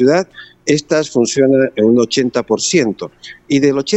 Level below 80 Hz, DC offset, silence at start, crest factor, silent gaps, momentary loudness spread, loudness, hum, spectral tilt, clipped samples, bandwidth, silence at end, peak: -52 dBFS; under 0.1%; 0 s; 14 dB; none; 10 LU; -14 LUFS; none; -4.5 dB/octave; under 0.1%; 8.4 kHz; 0 s; 0 dBFS